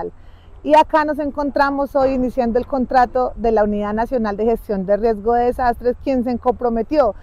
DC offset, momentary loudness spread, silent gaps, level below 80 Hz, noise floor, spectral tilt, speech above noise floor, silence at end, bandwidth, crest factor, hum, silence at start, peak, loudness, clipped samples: under 0.1%; 6 LU; none; -36 dBFS; -40 dBFS; -7 dB/octave; 23 dB; 0 s; 14.5 kHz; 14 dB; none; 0 s; -4 dBFS; -18 LUFS; under 0.1%